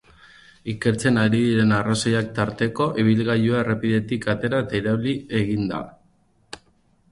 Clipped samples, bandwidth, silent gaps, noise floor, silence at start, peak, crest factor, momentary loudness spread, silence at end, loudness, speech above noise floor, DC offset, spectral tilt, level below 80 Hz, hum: under 0.1%; 11.5 kHz; none; -61 dBFS; 0.65 s; -6 dBFS; 16 dB; 14 LU; 0.55 s; -22 LUFS; 40 dB; under 0.1%; -6 dB/octave; -52 dBFS; none